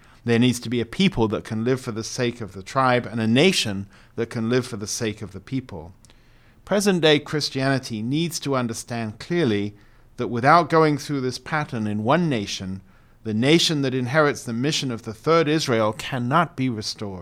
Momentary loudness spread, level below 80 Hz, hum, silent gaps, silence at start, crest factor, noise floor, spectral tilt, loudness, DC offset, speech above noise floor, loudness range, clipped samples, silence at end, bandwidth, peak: 13 LU; -52 dBFS; none; none; 0.25 s; 20 dB; -52 dBFS; -5 dB/octave; -22 LUFS; under 0.1%; 30 dB; 3 LU; under 0.1%; 0 s; 16 kHz; -2 dBFS